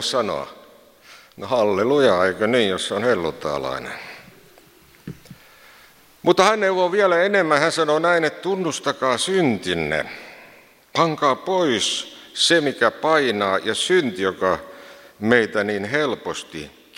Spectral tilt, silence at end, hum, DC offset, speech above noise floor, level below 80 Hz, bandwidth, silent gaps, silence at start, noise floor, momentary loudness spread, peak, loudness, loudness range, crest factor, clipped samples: -3.5 dB/octave; 0.3 s; none; under 0.1%; 31 dB; -58 dBFS; 16.5 kHz; none; 0 s; -51 dBFS; 15 LU; 0 dBFS; -20 LUFS; 5 LU; 20 dB; under 0.1%